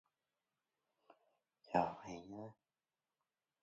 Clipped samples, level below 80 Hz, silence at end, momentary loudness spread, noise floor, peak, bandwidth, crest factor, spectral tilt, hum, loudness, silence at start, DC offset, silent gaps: under 0.1%; -78 dBFS; 1.1 s; 15 LU; under -90 dBFS; -20 dBFS; 7.4 kHz; 28 dB; -5.5 dB/octave; none; -42 LUFS; 1.65 s; under 0.1%; none